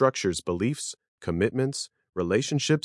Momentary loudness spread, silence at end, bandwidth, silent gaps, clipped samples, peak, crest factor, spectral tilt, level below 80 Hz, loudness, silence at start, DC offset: 10 LU; 0.05 s; 12 kHz; 1.08-1.18 s, 2.09-2.13 s; under 0.1%; -8 dBFS; 20 dB; -5 dB/octave; -60 dBFS; -28 LUFS; 0 s; under 0.1%